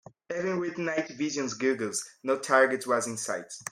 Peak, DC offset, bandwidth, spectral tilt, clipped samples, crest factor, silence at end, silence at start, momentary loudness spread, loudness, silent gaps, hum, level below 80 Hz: -8 dBFS; under 0.1%; 16 kHz; -3.5 dB/octave; under 0.1%; 22 dB; 0 s; 0.3 s; 10 LU; -29 LUFS; none; none; -76 dBFS